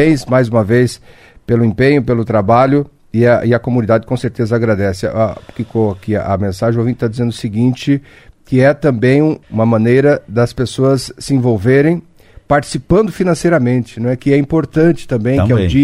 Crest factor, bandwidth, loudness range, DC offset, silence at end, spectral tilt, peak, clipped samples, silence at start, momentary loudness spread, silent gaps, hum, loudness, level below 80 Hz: 12 dB; 12.5 kHz; 3 LU; under 0.1%; 0 s; -7.5 dB/octave; 0 dBFS; under 0.1%; 0 s; 7 LU; none; none; -14 LUFS; -38 dBFS